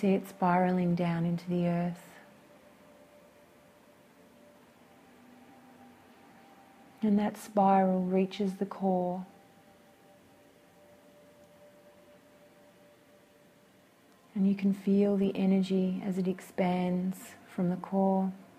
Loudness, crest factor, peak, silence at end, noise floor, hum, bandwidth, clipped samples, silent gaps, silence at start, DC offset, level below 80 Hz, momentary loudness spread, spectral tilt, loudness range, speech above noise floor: -30 LUFS; 18 dB; -14 dBFS; 0.15 s; -61 dBFS; none; 14 kHz; under 0.1%; none; 0 s; under 0.1%; -72 dBFS; 8 LU; -8 dB/octave; 9 LU; 33 dB